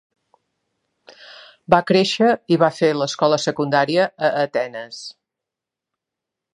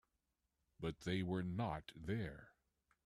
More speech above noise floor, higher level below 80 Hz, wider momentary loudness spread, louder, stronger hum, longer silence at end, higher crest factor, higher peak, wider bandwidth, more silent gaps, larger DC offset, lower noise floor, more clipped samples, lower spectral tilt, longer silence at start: first, 67 dB vs 45 dB; about the same, -62 dBFS vs -66 dBFS; first, 16 LU vs 8 LU; first, -18 LUFS vs -44 LUFS; neither; first, 1.45 s vs 0.55 s; about the same, 20 dB vs 18 dB; first, 0 dBFS vs -28 dBFS; second, 11 kHz vs 13 kHz; neither; neither; about the same, -86 dBFS vs -88 dBFS; neither; second, -5 dB/octave vs -7 dB/octave; first, 1.7 s vs 0.8 s